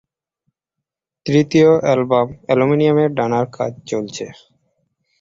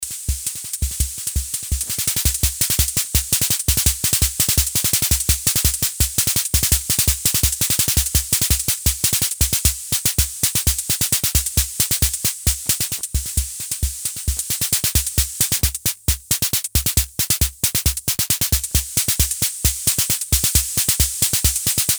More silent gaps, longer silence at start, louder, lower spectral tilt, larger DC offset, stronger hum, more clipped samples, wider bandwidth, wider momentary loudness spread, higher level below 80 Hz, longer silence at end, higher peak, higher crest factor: neither; first, 1.25 s vs 0 s; about the same, -16 LUFS vs -17 LUFS; first, -7 dB/octave vs -1.5 dB/octave; neither; neither; neither; second, 7.8 kHz vs over 20 kHz; first, 15 LU vs 7 LU; second, -56 dBFS vs -28 dBFS; first, 0.9 s vs 0 s; about the same, -2 dBFS vs 0 dBFS; about the same, 16 dB vs 20 dB